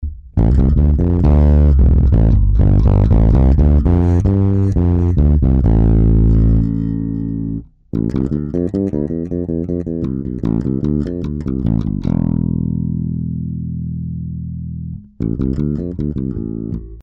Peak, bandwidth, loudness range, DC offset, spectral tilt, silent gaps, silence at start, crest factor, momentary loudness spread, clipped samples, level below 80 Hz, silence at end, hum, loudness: -6 dBFS; 4 kHz; 9 LU; under 0.1%; -11.5 dB/octave; none; 0 s; 8 dB; 12 LU; under 0.1%; -18 dBFS; 0 s; none; -16 LUFS